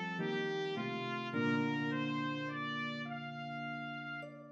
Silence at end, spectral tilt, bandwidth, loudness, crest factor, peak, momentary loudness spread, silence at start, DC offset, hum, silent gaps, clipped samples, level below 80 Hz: 0 s; -6.5 dB/octave; 7.8 kHz; -38 LUFS; 16 dB; -22 dBFS; 9 LU; 0 s; under 0.1%; none; none; under 0.1%; under -90 dBFS